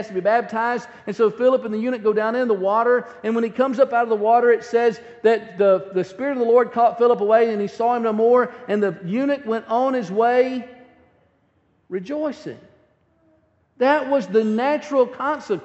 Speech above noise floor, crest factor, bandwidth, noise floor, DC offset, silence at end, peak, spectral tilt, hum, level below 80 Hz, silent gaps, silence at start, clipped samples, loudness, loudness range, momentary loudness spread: 44 dB; 16 dB; 8 kHz; -63 dBFS; under 0.1%; 0 s; -4 dBFS; -6.5 dB/octave; none; -70 dBFS; none; 0 s; under 0.1%; -20 LUFS; 7 LU; 8 LU